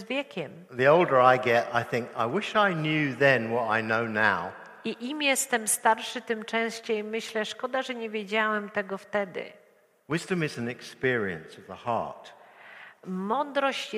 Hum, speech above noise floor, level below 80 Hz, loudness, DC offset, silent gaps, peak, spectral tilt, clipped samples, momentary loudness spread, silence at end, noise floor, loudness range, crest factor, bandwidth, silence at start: none; 22 dB; -72 dBFS; -27 LUFS; under 0.1%; none; -6 dBFS; -4 dB/octave; under 0.1%; 15 LU; 0 s; -49 dBFS; 8 LU; 22 dB; 15.5 kHz; 0 s